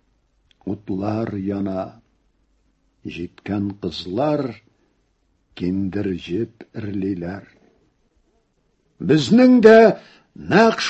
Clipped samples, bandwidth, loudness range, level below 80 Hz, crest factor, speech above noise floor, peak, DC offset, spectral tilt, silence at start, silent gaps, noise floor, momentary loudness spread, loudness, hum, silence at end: under 0.1%; 8.4 kHz; 12 LU; -50 dBFS; 20 dB; 47 dB; 0 dBFS; under 0.1%; -6.5 dB/octave; 0.65 s; none; -65 dBFS; 21 LU; -18 LUFS; none; 0 s